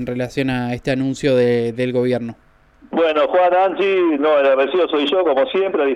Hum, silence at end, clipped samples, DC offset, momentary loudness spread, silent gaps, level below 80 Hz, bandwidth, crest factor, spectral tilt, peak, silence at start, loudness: none; 0 s; under 0.1%; under 0.1%; 7 LU; none; -50 dBFS; 11.5 kHz; 12 dB; -6.5 dB/octave; -6 dBFS; 0 s; -17 LUFS